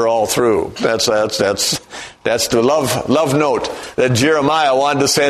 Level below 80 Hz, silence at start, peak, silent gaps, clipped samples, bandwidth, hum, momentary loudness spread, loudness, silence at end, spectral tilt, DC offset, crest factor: -48 dBFS; 0 s; 0 dBFS; none; under 0.1%; 13.5 kHz; none; 6 LU; -15 LUFS; 0 s; -3.5 dB/octave; under 0.1%; 14 dB